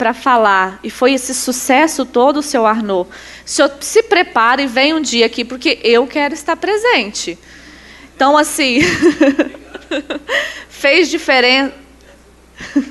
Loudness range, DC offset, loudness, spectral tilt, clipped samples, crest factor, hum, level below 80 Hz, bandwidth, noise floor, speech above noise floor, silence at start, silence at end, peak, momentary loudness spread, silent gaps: 2 LU; under 0.1%; -13 LUFS; -2.5 dB/octave; under 0.1%; 14 dB; 60 Hz at -50 dBFS; -48 dBFS; 12.5 kHz; -43 dBFS; 30 dB; 0 s; 0 s; 0 dBFS; 11 LU; none